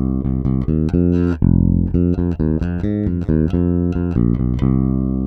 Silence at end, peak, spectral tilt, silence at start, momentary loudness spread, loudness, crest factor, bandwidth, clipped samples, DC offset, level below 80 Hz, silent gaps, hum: 0 s; 0 dBFS; -11.5 dB/octave; 0 s; 4 LU; -18 LUFS; 16 dB; 4.7 kHz; under 0.1%; under 0.1%; -26 dBFS; none; none